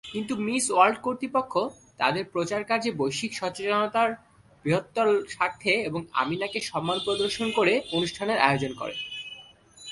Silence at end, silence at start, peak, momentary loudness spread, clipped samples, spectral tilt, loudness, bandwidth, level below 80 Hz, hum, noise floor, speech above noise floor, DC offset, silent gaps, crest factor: 0 s; 0.05 s; -4 dBFS; 10 LU; under 0.1%; -4 dB/octave; -26 LUFS; 11.5 kHz; -62 dBFS; none; -50 dBFS; 24 dB; under 0.1%; none; 24 dB